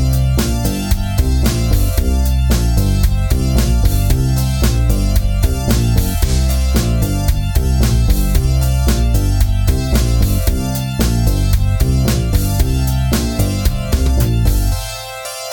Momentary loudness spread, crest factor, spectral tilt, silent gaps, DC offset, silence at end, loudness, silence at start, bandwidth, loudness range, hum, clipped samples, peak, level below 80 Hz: 3 LU; 12 dB; -5.5 dB/octave; none; under 0.1%; 0 s; -16 LUFS; 0 s; 18 kHz; 1 LU; none; under 0.1%; 0 dBFS; -16 dBFS